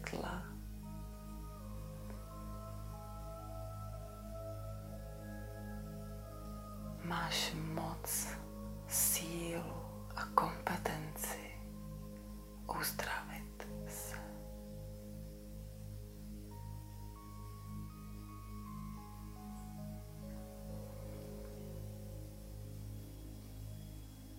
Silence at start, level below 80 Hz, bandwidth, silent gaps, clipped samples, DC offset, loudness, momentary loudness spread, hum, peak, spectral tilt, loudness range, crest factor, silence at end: 0 s; -52 dBFS; 16 kHz; none; under 0.1%; under 0.1%; -44 LUFS; 14 LU; 50 Hz at -70 dBFS; -12 dBFS; -3.5 dB/octave; 12 LU; 32 dB; 0 s